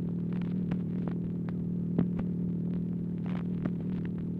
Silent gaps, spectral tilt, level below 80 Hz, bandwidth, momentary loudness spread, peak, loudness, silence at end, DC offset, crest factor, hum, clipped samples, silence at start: none; -11 dB/octave; -54 dBFS; 3.9 kHz; 4 LU; -14 dBFS; -33 LUFS; 0 s; under 0.1%; 18 dB; none; under 0.1%; 0 s